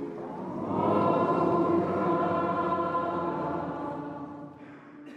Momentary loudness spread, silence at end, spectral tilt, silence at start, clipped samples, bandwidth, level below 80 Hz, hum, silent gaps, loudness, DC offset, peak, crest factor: 17 LU; 0 s; -9 dB/octave; 0 s; under 0.1%; 7.4 kHz; -64 dBFS; none; none; -28 LUFS; under 0.1%; -14 dBFS; 16 dB